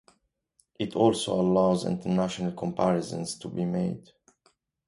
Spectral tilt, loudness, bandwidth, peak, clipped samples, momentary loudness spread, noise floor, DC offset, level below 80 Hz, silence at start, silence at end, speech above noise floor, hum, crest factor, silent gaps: -6.5 dB/octave; -27 LUFS; 11.5 kHz; -8 dBFS; under 0.1%; 10 LU; -70 dBFS; under 0.1%; -60 dBFS; 0.8 s; 0.9 s; 44 dB; none; 20 dB; none